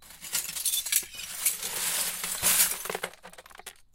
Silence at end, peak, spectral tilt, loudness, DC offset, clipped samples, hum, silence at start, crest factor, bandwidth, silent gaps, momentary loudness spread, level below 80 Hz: 0.2 s; -8 dBFS; 1 dB/octave; -27 LUFS; under 0.1%; under 0.1%; none; 0 s; 24 dB; 17 kHz; none; 16 LU; -60 dBFS